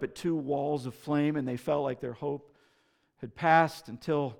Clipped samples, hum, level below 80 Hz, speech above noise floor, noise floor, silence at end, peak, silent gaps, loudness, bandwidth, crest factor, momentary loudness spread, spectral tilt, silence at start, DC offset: under 0.1%; none; -68 dBFS; 41 dB; -71 dBFS; 0.05 s; -10 dBFS; none; -30 LUFS; 17.5 kHz; 22 dB; 14 LU; -7 dB/octave; 0 s; under 0.1%